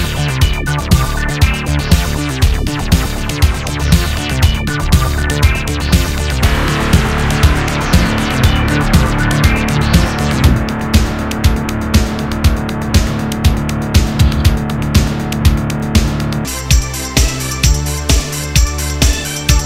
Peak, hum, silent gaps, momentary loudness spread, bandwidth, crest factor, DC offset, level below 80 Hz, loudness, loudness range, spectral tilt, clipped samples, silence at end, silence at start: 0 dBFS; none; none; 4 LU; 16.5 kHz; 12 dB; under 0.1%; -16 dBFS; -14 LUFS; 2 LU; -4.5 dB/octave; 0.5%; 0 s; 0 s